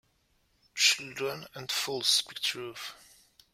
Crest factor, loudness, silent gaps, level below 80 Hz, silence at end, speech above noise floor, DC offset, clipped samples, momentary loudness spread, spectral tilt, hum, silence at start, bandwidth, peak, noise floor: 24 dB; -28 LUFS; none; -74 dBFS; 0.6 s; 38 dB; under 0.1%; under 0.1%; 17 LU; 0 dB/octave; none; 0.75 s; 16.5 kHz; -10 dBFS; -71 dBFS